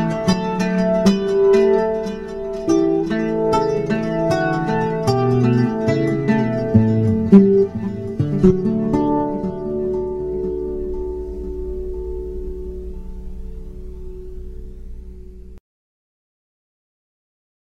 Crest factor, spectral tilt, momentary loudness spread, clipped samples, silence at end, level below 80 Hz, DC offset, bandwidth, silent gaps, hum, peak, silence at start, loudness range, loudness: 20 dB; -8 dB/octave; 21 LU; under 0.1%; 2.15 s; -34 dBFS; under 0.1%; 12 kHz; none; none; 0 dBFS; 0 s; 19 LU; -18 LUFS